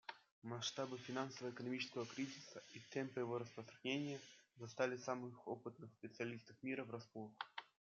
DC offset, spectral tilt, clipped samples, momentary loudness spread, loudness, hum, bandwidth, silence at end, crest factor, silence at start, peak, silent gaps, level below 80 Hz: under 0.1%; -3.5 dB/octave; under 0.1%; 12 LU; -48 LUFS; none; 7.4 kHz; 0.35 s; 22 dB; 0.1 s; -26 dBFS; 0.31-0.42 s; under -90 dBFS